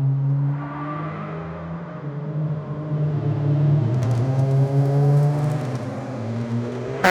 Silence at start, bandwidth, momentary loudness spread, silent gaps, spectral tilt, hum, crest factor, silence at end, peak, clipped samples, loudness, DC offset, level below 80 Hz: 0 s; 7.2 kHz; 12 LU; none; -8 dB/octave; none; 18 dB; 0 s; -2 dBFS; under 0.1%; -23 LUFS; under 0.1%; -54 dBFS